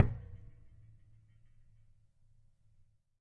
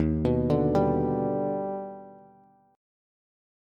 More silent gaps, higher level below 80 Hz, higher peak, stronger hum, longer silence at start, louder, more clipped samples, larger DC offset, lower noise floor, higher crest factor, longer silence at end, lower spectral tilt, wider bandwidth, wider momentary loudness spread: neither; second, -54 dBFS vs -44 dBFS; about the same, -10 dBFS vs -12 dBFS; neither; about the same, 0 s vs 0 s; second, -38 LUFS vs -26 LUFS; neither; neither; first, -67 dBFS vs -58 dBFS; first, 30 dB vs 16 dB; first, 2.85 s vs 1.6 s; about the same, -10 dB/octave vs -10 dB/octave; second, 3.6 kHz vs 7 kHz; first, 24 LU vs 13 LU